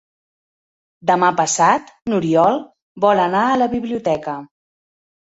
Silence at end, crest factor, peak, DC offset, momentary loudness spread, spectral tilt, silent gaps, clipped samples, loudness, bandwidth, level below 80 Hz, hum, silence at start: 0.85 s; 16 dB; -2 dBFS; under 0.1%; 9 LU; -4.5 dB/octave; 2.82-2.95 s; under 0.1%; -17 LUFS; 8.4 kHz; -56 dBFS; none; 1.05 s